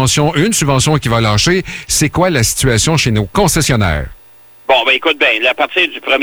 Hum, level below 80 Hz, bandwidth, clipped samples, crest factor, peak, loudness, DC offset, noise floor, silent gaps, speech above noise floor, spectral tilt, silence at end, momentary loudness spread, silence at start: none; -30 dBFS; over 20 kHz; under 0.1%; 12 dB; -2 dBFS; -12 LUFS; under 0.1%; -40 dBFS; none; 28 dB; -3.5 dB/octave; 0 s; 4 LU; 0 s